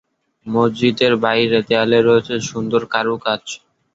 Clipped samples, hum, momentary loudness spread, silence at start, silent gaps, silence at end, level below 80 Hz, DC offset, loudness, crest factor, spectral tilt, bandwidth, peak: under 0.1%; none; 10 LU; 0.45 s; none; 0.4 s; -56 dBFS; under 0.1%; -17 LUFS; 18 dB; -5 dB/octave; 7.8 kHz; 0 dBFS